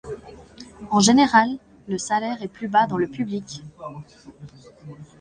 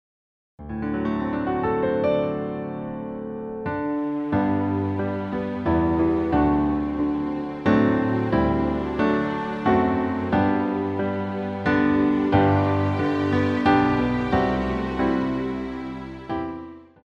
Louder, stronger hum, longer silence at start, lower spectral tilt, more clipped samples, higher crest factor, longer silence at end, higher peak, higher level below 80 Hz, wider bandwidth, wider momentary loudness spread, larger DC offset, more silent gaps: about the same, -21 LUFS vs -23 LUFS; neither; second, 0.05 s vs 0.6 s; second, -4 dB/octave vs -8.5 dB/octave; neither; about the same, 22 dB vs 18 dB; about the same, 0.15 s vs 0.2 s; about the same, -2 dBFS vs -4 dBFS; second, -56 dBFS vs -42 dBFS; first, 10.5 kHz vs 6.6 kHz; first, 26 LU vs 11 LU; neither; neither